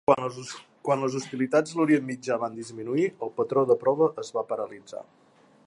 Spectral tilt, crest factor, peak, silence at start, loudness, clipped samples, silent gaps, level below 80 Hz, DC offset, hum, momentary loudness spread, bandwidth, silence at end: -6 dB/octave; 20 dB; -6 dBFS; 0.1 s; -27 LUFS; under 0.1%; none; -72 dBFS; under 0.1%; none; 14 LU; 11.5 kHz; 0.65 s